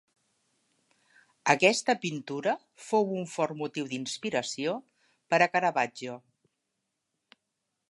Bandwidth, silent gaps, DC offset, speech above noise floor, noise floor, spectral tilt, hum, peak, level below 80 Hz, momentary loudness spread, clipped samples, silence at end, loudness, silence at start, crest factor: 11.5 kHz; none; under 0.1%; 54 dB; -83 dBFS; -3.5 dB/octave; none; -6 dBFS; -82 dBFS; 12 LU; under 0.1%; 1.7 s; -29 LUFS; 1.45 s; 26 dB